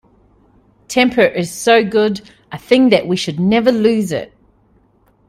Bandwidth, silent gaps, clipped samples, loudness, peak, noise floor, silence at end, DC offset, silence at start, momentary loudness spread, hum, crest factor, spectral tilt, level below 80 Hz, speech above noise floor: 15.5 kHz; none; under 0.1%; -14 LUFS; 0 dBFS; -55 dBFS; 1.05 s; under 0.1%; 0.9 s; 14 LU; none; 16 dB; -5 dB/octave; -52 dBFS; 41 dB